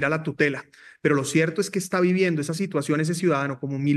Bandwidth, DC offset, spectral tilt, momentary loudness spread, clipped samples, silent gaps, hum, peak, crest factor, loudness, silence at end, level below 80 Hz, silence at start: 12.5 kHz; under 0.1%; -5.5 dB/octave; 6 LU; under 0.1%; none; none; -6 dBFS; 18 dB; -24 LUFS; 0 s; -70 dBFS; 0 s